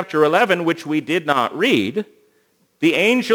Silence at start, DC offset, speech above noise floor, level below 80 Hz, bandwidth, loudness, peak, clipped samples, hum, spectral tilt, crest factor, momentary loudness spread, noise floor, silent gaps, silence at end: 0 s; under 0.1%; 44 dB; -70 dBFS; over 20 kHz; -18 LUFS; 0 dBFS; under 0.1%; none; -5 dB/octave; 18 dB; 8 LU; -61 dBFS; none; 0 s